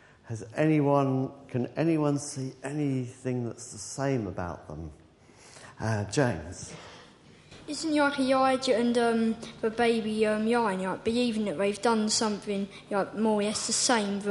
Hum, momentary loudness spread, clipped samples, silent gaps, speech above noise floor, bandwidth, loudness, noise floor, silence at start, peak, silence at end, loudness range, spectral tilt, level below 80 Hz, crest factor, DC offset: none; 16 LU; under 0.1%; none; 27 dB; 11.5 kHz; -28 LUFS; -55 dBFS; 0.25 s; -10 dBFS; 0 s; 8 LU; -4.5 dB/octave; -58 dBFS; 18 dB; under 0.1%